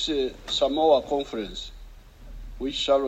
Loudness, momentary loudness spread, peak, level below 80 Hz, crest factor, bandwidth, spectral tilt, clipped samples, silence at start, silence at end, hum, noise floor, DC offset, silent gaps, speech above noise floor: -25 LUFS; 19 LU; -8 dBFS; -44 dBFS; 18 dB; 13 kHz; -4 dB/octave; under 0.1%; 0 s; 0 s; none; -45 dBFS; under 0.1%; none; 20 dB